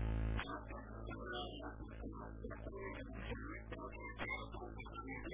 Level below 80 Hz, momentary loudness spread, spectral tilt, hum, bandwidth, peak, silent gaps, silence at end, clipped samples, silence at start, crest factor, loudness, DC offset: -50 dBFS; 7 LU; -4.5 dB/octave; none; 3.9 kHz; -28 dBFS; none; 0 s; under 0.1%; 0 s; 18 dB; -48 LUFS; under 0.1%